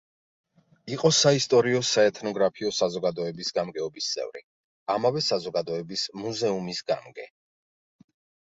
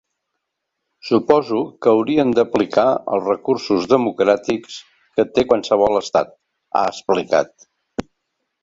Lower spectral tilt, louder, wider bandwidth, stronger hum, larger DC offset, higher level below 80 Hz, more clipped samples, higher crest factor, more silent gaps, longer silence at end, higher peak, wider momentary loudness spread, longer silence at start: second, -3.5 dB/octave vs -5.5 dB/octave; second, -25 LUFS vs -18 LUFS; about the same, 8 kHz vs 7.8 kHz; neither; neither; second, -68 dBFS vs -54 dBFS; neither; about the same, 20 dB vs 18 dB; first, 4.44-4.86 s vs none; first, 1.2 s vs 0.6 s; second, -6 dBFS vs -2 dBFS; about the same, 14 LU vs 15 LU; second, 0.85 s vs 1.05 s